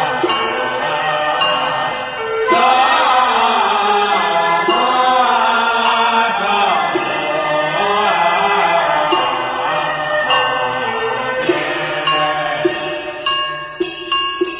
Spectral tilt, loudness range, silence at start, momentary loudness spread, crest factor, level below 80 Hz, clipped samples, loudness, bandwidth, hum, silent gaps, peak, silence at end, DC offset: -7 dB/octave; 4 LU; 0 s; 6 LU; 14 dB; -52 dBFS; under 0.1%; -15 LUFS; 4 kHz; none; none; -2 dBFS; 0 s; under 0.1%